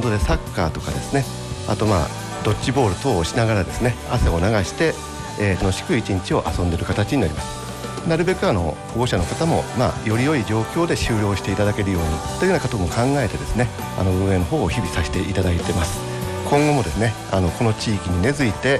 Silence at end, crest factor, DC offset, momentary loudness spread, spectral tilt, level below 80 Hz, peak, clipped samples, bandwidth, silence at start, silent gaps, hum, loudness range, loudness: 0 s; 14 dB; under 0.1%; 5 LU; -5.5 dB/octave; -32 dBFS; -6 dBFS; under 0.1%; 13 kHz; 0 s; none; none; 1 LU; -21 LUFS